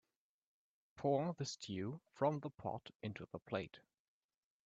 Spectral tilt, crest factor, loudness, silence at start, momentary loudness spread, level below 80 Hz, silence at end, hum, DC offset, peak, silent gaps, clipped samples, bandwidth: -6 dB/octave; 22 dB; -43 LUFS; 0.95 s; 11 LU; -78 dBFS; 0.9 s; none; under 0.1%; -24 dBFS; 2.95-3.00 s, 3.42-3.46 s; under 0.1%; 8.2 kHz